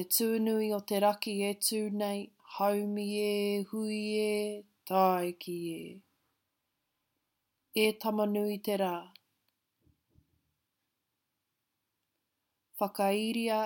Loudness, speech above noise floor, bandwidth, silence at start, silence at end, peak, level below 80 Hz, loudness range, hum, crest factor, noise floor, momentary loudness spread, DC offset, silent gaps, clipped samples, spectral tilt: -32 LUFS; 53 dB; 17 kHz; 0 s; 0 s; -14 dBFS; -84 dBFS; 7 LU; none; 20 dB; -84 dBFS; 10 LU; under 0.1%; none; under 0.1%; -4 dB/octave